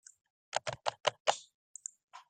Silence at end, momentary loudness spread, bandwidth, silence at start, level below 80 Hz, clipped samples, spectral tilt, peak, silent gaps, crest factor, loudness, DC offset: 0.1 s; 14 LU; 9.8 kHz; 0.55 s; -76 dBFS; under 0.1%; -0.5 dB/octave; -10 dBFS; 1.00-1.04 s, 1.20-1.25 s, 1.54-1.75 s, 2.03-2.08 s; 30 dB; -37 LUFS; under 0.1%